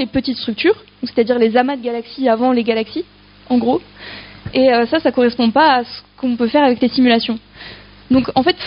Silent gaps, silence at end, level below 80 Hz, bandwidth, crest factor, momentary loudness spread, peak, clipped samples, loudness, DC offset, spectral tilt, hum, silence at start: none; 0 s; -48 dBFS; 5.4 kHz; 14 dB; 16 LU; -2 dBFS; under 0.1%; -16 LUFS; under 0.1%; -2.5 dB/octave; 50 Hz at -45 dBFS; 0 s